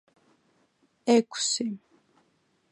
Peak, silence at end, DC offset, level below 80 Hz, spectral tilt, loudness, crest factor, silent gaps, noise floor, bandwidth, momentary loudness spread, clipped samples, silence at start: -10 dBFS; 0.95 s; under 0.1%; -84 dBFS; -3 dB/octave; -26 LUFS; 22 dB; none; -70 dBFS; 11 kHz; 12 LU; under 0.1%; 1.05 s